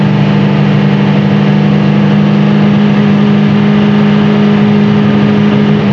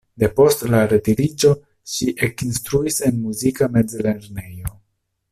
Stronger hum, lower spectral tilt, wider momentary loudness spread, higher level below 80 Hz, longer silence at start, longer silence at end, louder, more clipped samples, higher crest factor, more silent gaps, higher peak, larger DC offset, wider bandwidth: neither; first, -8.5 dB/octave vs -5.5 dB/octave; second, 1 LU vs 14 LU; about the same, -44 dBFS vs -44 dBFS; second, 0 s vs 0.2 s; second, 0 s vs 0.6 s; first, -8 LUFS vs -19 LUFS; neither; second, 8 dB vs 16 dB; neither; first, 0 dBFS vs -4 dBFS; neither; second, 6.2 kHz vs 16 kHz